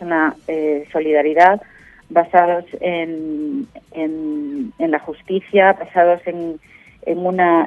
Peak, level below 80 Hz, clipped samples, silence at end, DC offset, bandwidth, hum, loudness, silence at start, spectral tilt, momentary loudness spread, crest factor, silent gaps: 0 dBFS; -58 dBFS; under 0.1%; 0 s; under 0.1%; 7 kHz; none; -18 LUFS; 0 s; -7.5 dB/octave; 12 LU; 18 dB; none